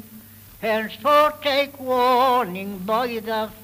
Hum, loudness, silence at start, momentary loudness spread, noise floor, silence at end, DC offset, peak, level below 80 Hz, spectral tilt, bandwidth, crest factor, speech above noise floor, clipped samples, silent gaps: none; -21 LUFS; 0.05 s; 10 LU; -44 dBFS; 0 s; under 0.1%; -4 dBFS; -56 dBFS; -4.5 dB/octave; 16 kHz; 18 dB; 23 dB; under 0.1%; none